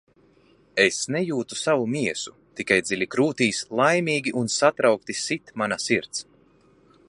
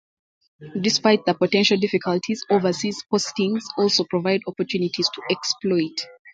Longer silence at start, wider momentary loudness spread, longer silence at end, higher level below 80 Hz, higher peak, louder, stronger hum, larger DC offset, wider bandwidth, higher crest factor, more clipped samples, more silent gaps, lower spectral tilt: first, 0.75 s vs 0.6 s; about the same, 9 LU vs 7 LU; first, 0.85 s vs 0.05 s; about the same, -64 dBFS vs -66 dBFS; about the same, -2 dBFS vs -4 dBFS; about the same, -23 LUFS vs -22 LUFS; neither; neither; first, 11.5 kHz vs 9.2 kHz; about the same, 22 dB vs 18 dB; neither; second, none vs 6.19-6.25 s; about the same, -3.5 dB/octave vs -4 dB/octave